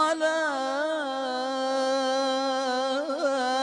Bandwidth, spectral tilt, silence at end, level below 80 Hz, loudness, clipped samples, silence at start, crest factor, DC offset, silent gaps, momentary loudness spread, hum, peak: 10.5 kHz; -1 dB/octave; 0 s; -78 dBFS; -27 LUFS; under 0.1%; 0 s; 14 dB; under 0.1%; none; 4 LU; none; -12 dBFS